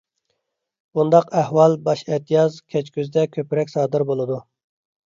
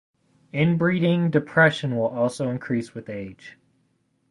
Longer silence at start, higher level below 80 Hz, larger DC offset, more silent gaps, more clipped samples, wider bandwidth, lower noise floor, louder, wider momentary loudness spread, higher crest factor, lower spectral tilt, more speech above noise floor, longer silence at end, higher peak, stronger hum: first, 0.95 s vs 0.55 s; second, -68 dBFS vs -60 dBFS; neither; neither; neither; second, 7.6 kHz vs 11.5 kHz; first, -75 dBFS vs -68 dBFS; about the same, -20 LUFS vs -22 LUFS; second, 10 LU vs 15 LU; about the same, 20 dB vs 20 dB; about the same, -7.5 dB/octave vs -7 dB/octave; first, 56 dB vs 46 dB; second, 0.65 s vs 0.8 s; about the same, -2 dBFS vs -4 dBFS; neither